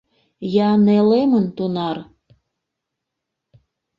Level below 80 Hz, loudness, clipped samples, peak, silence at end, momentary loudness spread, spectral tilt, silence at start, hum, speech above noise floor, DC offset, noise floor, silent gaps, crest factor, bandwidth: -62 dBFS; -17 LUFS; under 0.1%; -4 dBFS; 1.95 s; 13 LU; -9.5 dB/octave; 0.4 s; none; 64 dB; under 0.1%; -81 dBFS; none; 16 dB; 5.6 kHz